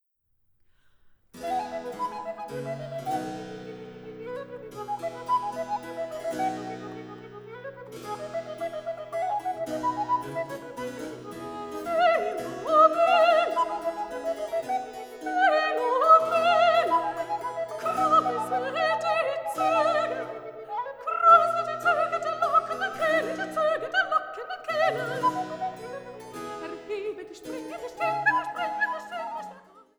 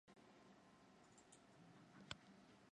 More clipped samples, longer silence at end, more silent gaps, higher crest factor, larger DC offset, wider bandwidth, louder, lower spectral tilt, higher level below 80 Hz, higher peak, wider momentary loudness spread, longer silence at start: neither; first, 0.2 s vs 0.05 s; neither; second, 22 dB vs 34 dB; neither; first, over 20 kHz vs 10.5 kHz; first, -26 LUFS vs -64 LUFS; about the same, -4 dB/octave vs -3.5 dB/octave; first, -66 dBFS vs -84 dBFS; first, -6 dBFS vs -32 dBFS; first, 18 LU vs 11 LU; first, 1.35 s vs 0.05 s